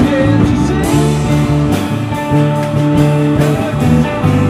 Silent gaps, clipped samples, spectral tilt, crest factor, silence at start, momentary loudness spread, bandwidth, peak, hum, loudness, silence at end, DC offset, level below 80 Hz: none; under 0.1%; -7 dB/octave; 12 dB; 0 s; 3 LU; 15 kHz; 0 dBFS; none; -12 LUFS; 0 s; under 0.1%; -28 dBFS